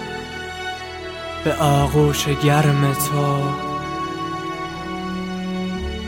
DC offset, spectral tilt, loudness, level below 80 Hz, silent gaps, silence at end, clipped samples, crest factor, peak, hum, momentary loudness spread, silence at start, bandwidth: under 0.1%; -5.5 dB/octave; -21 LUFS; -38 dBFS; none; 0 s; under 0.1%; 18 dB; -2 dBFS; none; 13 LU; 0 s; 17 kHz